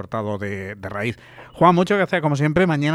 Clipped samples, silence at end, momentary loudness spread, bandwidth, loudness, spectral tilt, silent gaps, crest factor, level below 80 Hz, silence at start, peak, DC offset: under 0.1%; 0 s; 13 LU; 12 kHz; -20 LUFS; -7 dB/octave; none; 18 dB; -50 dBFS; 0 s; -2 dBFS; under 0.1%